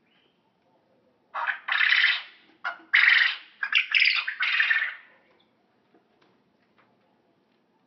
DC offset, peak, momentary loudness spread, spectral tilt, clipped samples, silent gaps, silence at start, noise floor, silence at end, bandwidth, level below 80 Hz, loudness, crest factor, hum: under 0.1%; -8 dBFS; 18 LU; 1.5 dB/octave; under 0.1%; none; 1.35 s; -67 dBFS; 2.9 s; 6.2 kHz; -90 dBFS; -22 LUFS; 20 dB; none